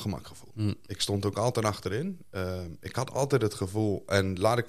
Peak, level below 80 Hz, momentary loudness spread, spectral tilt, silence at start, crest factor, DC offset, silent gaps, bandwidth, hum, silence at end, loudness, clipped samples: -8 dBFS; -60 dBFS; 9 LU; -5.5 dB/octave; 0 s; 20 dB; 0.3%; none; 15 kHz; none; 0 s; -30 LUFS; under 0.1%